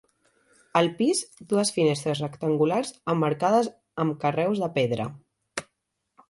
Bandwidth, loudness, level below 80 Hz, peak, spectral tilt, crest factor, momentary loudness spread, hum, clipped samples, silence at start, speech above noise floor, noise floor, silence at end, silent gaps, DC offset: 11.5 kHz; -25 LUFS; -68 dBFS; -6 dBFS; -5 dB/octave; 20 dB; 9 LU; none; under 0.1%; 0.75 s; 53 dB; -78 dBFS; 0.65 s; none; under 0.1%